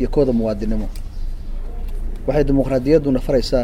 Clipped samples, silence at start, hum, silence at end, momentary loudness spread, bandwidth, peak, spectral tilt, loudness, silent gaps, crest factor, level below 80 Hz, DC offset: under 0.1%; 0 s; none; 0 s; 17 LU; 12.5 kHz; -2 dBFS; -7.5 dB/octave; -19 LUFS; none; 16 dB; -24 dBFS; under 0.1%